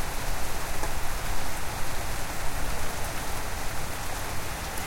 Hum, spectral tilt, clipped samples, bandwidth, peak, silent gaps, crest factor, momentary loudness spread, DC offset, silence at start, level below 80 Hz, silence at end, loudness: none; -3 dB/octave; under 0.1%; 17 kHz; -14 dBFS; none; 12 dB; 1 LU; under 0.1%; 0 s; -34 dBFS; 0 s; -33 LUFS